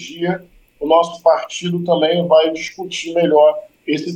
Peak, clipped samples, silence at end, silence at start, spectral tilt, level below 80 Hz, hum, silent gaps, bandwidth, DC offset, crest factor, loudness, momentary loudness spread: -2 dBFS; under 0.1%; 0 s; 0 s; -5 dB/octave; -58 dBFS; none; none; 9.4 kHz; under 0.1%; 16 dB; -16 LUFS; 12 LU